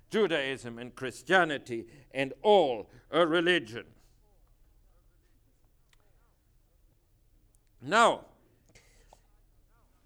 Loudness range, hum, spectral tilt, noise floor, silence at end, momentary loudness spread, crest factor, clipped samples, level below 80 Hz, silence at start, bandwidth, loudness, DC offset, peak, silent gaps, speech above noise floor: 5 LU; none; -4 dB/octave; -66 dBFS; 1.85 s; 16 LU; 22 dB; under 0.1%; -64 dBFS; 0.1 s; 15.5 kHz; -28 LUFS; under 0.1%; -10 dBFS; none; 38 dB